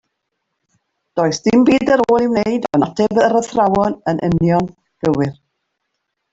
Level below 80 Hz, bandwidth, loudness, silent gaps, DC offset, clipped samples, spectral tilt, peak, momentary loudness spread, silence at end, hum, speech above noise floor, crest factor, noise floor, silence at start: -48 dBFS; 8 kHz; -16 LUFS; none; under 0.1%; under 0.1%; -6.5 dB/octave; -2 dBFS; 7 LU; 1 s; none; 59 dB; 14 dB; -74 dBFS; 1.15 s